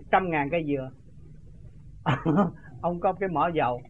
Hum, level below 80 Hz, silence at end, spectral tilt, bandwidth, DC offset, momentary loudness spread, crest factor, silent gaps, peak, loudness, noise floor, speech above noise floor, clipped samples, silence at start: none; -50 dBFS; 0.05 s; -8.5 dB/octave; 7.6 kHz; 0.3%; 8 LU; 20 dB; none; -8 dBFS; -27 LUFS; -48 dBFS; 23 dB; under 0.1%; 0 s